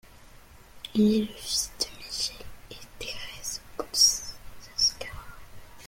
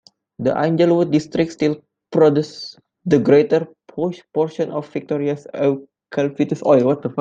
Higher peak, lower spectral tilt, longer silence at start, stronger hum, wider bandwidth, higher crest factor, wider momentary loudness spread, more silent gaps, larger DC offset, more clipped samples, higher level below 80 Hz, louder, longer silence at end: second, -8 dBFS vs -2 dBFS; second, -2.5 dB/octave vs -7.5 dB/octave; second, 0.1 s vs 0.4 s; neither; first, 16.5 kHz vs 7.8 kHz; about the same, 22 dB vs 18 dB; first, 25 LU vs 13 LU; neither; neither; neither; first, -50 dBFS vs -60 dBFS; second, -26 LUFS vs -19 LUFS; about the same, 0 s vs 0 s